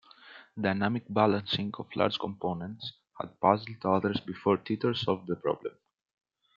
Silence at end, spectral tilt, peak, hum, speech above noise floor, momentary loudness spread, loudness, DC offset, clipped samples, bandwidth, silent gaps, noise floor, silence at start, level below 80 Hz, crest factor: 0.9 s; -7.5 dB/octave; -8 dBFS; none; 24 dB; 15 LU; -30 LUFS; under 0.1%; under 0.1%; 7.2 kHz; none; -53 dBFS; 0.25 s; -70 dBFS; 24 dB